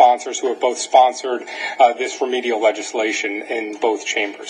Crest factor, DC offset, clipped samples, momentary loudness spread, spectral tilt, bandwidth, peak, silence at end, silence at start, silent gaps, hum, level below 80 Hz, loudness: 18 dB; under 0.1%; under 0.1%; 10 LU; -0.5 dB/octave; 10.5 kHz; 0 dBFS; 0 s; 0 s; none; none; -78 dBFS; -19 LUFS